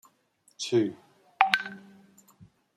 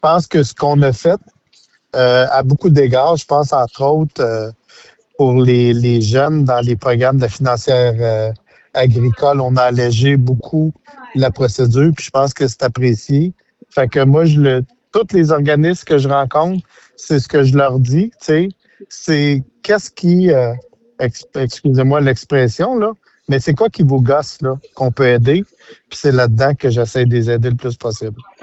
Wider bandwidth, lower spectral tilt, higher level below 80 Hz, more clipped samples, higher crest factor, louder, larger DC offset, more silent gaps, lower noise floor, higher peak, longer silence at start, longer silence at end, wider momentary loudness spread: first, 15.5 kHz vs 8.2 kHz; second, -4 dB/octave vs -7 dB/octave; second, -76 dBFS vs -46 dBFS; neither; first, 30 dB vs 12 dB; second, -27 LUFS vs -14 LUFS; neither; neither; first, -67 dBFS vs -54 dBFS; about the same, -2 dBFS vs -2 dBFS; first, 0.6 s vs 0.05 s; first, 0.35 s vs 0.2 s; first, 16 LU vs 10 LU